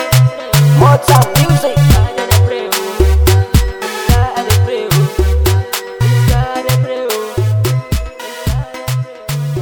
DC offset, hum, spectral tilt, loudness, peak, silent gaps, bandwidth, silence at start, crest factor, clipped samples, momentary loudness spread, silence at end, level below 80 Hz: under 0.1%; none; -5.5 dB/octave; -13 LUFS; 0 dBFS; none; over 20 kHz; 0 s; 12 dB; under 0.1%; 11 LU; 0 s; -20 dBFS